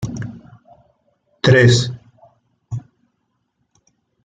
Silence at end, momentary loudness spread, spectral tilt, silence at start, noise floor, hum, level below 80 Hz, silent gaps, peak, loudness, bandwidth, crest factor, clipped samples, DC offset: 1.45 s; 21 LU; -5.5 dB/octave; 0 s; -70 dBFS; none; -50 dBFS; none; -2 dBFS; -14 LUFS; 9.2 kHz; 18 dB; under 0.1%; under 0.1%